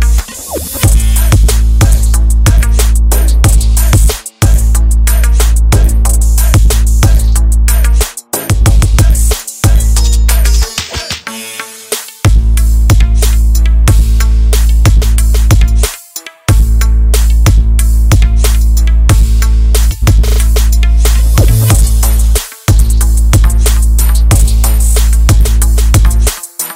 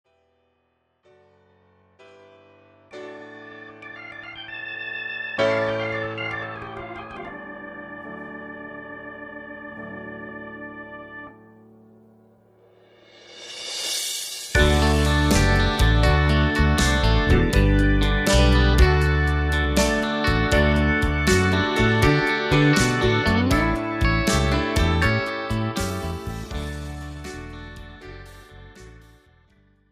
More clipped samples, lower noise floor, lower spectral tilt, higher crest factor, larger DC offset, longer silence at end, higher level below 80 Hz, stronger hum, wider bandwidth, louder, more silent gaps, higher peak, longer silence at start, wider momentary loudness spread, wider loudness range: neither; second, -28 dBFS vs -69 dBFS; about the same, -4.5 dB/octave vs -5 dB/octave; second, 6 dB vs 18 dB; neither; second, 0 s vs 0.95 s; first, -8 dBFS vs -28 dBFS; neither; about the same, 16.5 kHz vs 16 kHz; first, -10 LUFS vs -21 LUFS; neither; first, 0 dBFS vs -4 dBFS; second, 0 s vs 2.95 s; second, 5 LU vs 20 LU; second, 2 LU vs 19 LU